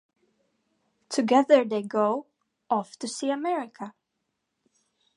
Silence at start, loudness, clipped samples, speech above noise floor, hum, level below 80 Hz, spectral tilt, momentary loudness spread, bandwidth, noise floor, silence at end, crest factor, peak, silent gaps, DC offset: 1.1 s; -25 LUFS; under 0.1%; 56 dB; none; -86 dBFS; -4.5 dB/octave; 15 LU; 11.5 kHz; -80 dBFS; 1.25 s; 22 dB; -6 dBFS; none; under 0.1%